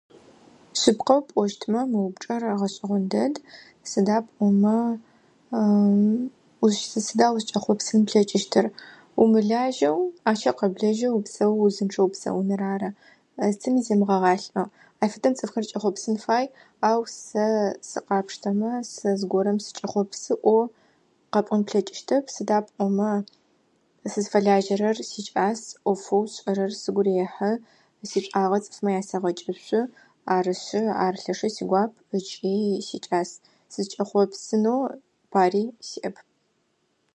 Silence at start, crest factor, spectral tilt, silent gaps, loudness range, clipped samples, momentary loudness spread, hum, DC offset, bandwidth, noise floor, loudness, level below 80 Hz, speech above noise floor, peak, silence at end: 0.75 s; 20 dB; -5.5 dB/octave; none; 4 LU; under 0.1%; 10 LU; none; under 0.1%; 9.4 kHz; -70 dBFS; -24 LUFS; -72 dBFS; 47 dB; -4 dBFS; 1.05 s